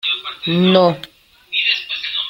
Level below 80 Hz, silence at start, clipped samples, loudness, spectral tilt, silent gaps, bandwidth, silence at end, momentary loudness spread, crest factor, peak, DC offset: -58 dBFS; 0.05 s; under 0.1%; -16 LUFS; -6.5 dB/octave; none; 15 kHz; 0 s; 9 LU; 16 dB; -2 dBFS; under 0.1%